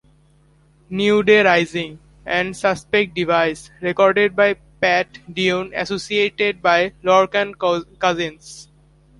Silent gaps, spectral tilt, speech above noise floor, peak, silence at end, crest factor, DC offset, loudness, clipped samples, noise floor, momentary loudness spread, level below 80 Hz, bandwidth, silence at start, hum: none; -4.5 dB/octave; 36 dB; -2 dBFS; 0.55 s; 18 dB; under 0.1%; -18 LUFS; under 0.1%; -54 dBFS; 12 LU; -52 dBFS; 11.5 kHz; 0.9 s; none